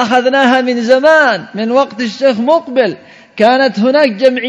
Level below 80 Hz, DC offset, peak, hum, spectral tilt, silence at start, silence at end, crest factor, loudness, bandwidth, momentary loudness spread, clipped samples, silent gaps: -62 dBFS; under 0.1%; 0 dBFS; none; -5 dB/octave; 0 s; 0 s; 10 dB; -11 LUFS; 8.8 kHz; 9 LU; 0.6%; none